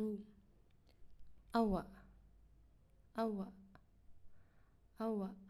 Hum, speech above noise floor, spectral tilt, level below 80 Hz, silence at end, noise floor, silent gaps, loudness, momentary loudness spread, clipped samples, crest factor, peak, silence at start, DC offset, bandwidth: none; 28 dB; -8 dB/octave; -62 dBFS; 0 s; -68 dBFS; none; -42 LUFS; 15 LU; under 0.1%; 22 dB; -24 dBFS; 0 s; under 0.1%; 12.5 kHz